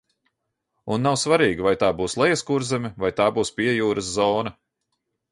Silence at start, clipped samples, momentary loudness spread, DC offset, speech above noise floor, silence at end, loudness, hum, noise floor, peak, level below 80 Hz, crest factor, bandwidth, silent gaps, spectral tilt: 0.85 s; under 0.1%; 7 LU; under 0.1%; 56 dB; 0.8 s; -22 LUFS; none; -77 dBFS; -6 dBFS; -52 dBFS; 18 dB; 11.5 kHz; none; -4.5 dB/octave